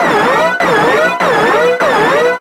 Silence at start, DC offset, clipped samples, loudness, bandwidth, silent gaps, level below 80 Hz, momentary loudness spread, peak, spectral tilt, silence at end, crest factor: 0 s; under 0.1%; under 0.1%; -10 LUFS; 16.5 kHz; none; -46 dBFS; 1 LU; -2 dBFS; -4 dB/octave; 0 s; 10 dB